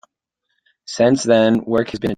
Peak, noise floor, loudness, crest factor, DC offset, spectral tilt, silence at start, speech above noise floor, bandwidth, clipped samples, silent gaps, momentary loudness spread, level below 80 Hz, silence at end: -2 dBFS; -75 dBFS; -16 LUFS; 16 dB; under 0.1%; -5.5 dB/octave; 0.9 s; 59 dB; 9.4 kHz; under 0.1%; none; 6 LU; -52 dBFS; 0.05 s